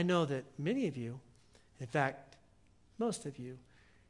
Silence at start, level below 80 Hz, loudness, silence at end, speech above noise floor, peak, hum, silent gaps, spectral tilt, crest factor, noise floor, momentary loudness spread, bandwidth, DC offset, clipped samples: 0 s; -72 dBFS; -37 LUFS; 0.5 s; 30 dB; -16 dBFS; none; none; -6 dB/octave; 22 dB; -66 dBFS; 17 LU; 11.5 kHz; under 0.1%; under 0.1%